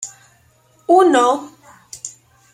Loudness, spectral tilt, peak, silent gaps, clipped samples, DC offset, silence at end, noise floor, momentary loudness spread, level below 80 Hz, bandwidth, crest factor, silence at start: -14 LUFS; -2.5 dB/octave; -2 dBFS; none; under 0.1%; under 0.1%; 0.45 s; -55 dBFS; 21 LU; -66 dBFS; 13 kHz; 16 dB; 0 s